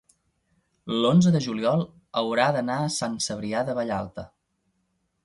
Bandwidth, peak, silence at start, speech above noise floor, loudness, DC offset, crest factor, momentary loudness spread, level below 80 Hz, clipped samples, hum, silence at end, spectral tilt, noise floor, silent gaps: 11.5 kHz; -6 dBFS; 0.85 s; 49 dB; -25 LUFS; under 0.1%; 18 dB; 11 LU; -60 dBFS; under 0.1%; none; 1 s; -5.5 dB/octave; -73 dBFS; none